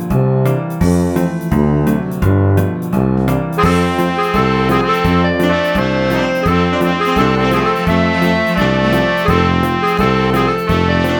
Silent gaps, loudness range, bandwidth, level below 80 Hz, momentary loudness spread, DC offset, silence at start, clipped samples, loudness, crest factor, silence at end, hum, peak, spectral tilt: none; 1 LU; over 20 kHz; -30 dBFS; 3 LU; under 0.1%; 0 s; under 0.1%; -14 LUFS; 14 dB; 0 s; none; 0 dBFS; -7 dB/octave